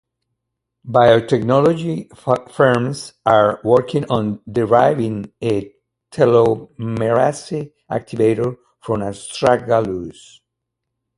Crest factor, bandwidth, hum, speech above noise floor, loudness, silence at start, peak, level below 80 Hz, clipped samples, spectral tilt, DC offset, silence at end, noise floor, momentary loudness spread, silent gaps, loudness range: 18 dB; 11.5 kHz; none; 62 dB; -17 LUFS; 0.85 s; 0 dBFS; -52 dBFS; under 0.1%; -6.5 dB/octave; under 0.1%; 1.05 s; -78 dBFS; 12 LU; none; 4 LU